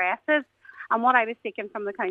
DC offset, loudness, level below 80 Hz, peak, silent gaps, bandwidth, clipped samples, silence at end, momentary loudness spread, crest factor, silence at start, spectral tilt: under 0.1%; -25 LUFS; -80 dBFS; -6 dBFS; none; 7 kHz; under 0.1%; 0 s; 13 LU; 20 dB; 0 s; -6 dB/octave